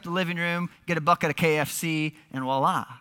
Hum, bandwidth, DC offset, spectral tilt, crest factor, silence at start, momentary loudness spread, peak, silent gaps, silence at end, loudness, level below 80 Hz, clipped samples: none; 17.5 kHz; under 0.1%; -5 dB/octave; 18 dB; 0.05 s; 7 LU; -8 dBFS; none; 0.05 s; -26 LUFS; -64 dBFS; under 0.1%